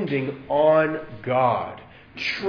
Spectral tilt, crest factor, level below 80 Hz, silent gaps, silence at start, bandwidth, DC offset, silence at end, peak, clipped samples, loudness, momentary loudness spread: -7 dB/octave; 16 dB; -58 dBFS; none; 0 s; 5.4 kHz; under 0.1%; 0 s; -6 dBFS; under 0.1%; -22 LUFS; 17 LU